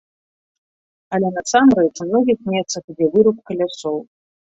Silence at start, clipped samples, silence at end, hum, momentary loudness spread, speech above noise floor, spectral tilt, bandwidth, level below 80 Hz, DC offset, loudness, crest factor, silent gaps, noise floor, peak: 1.1 s; under 0.1%; 0.45 s; none; 12 LU; over 73 dB; -5 dB/octave; 8 kHz; -58 dBFS; under 0.1%; -18 LUFS; 18 dB; 2.84-2.88 s; under -90 dBFS; -2 dBFS